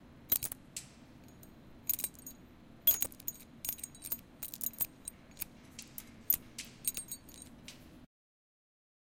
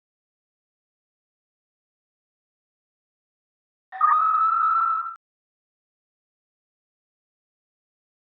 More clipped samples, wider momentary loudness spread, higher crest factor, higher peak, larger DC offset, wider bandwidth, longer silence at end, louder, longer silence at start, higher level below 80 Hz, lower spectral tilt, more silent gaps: neither; first, 23 LU vs 8 LU; first, 32 dB vs 20 dB; about the same, -10 dBFS vs -8 dBFS; neither; first, 17 kHz vs 4.3 kHz; second, 1 s vs 3.25 s; second, -36 LUFS vs -20 LUFS; second, 0 s vs 3.9 s; first, -64 dBFS vs under -90 dBFS; first, -1 dB/octave vs 5.5 dB/octave; neither